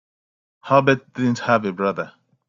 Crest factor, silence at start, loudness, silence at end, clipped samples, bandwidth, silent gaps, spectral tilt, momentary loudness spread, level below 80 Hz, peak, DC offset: 20 dB; 0.65 s; -20 LUFS; 0.4 s; under 0.1%; 7.6 kHz; none; -6.5 dB/octave; 10 LU; -62 dBFS; -2 dBFS; under 0.1%